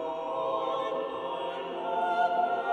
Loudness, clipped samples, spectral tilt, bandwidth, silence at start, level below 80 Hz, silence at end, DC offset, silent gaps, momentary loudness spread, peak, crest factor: -31 LUFS; under 0.1%; -5 dB/octave; 9 kHz; 0 s; -72 dBFS; 0 s; under 0.1%; none; 7 LU; -16 dBFS; 16 dB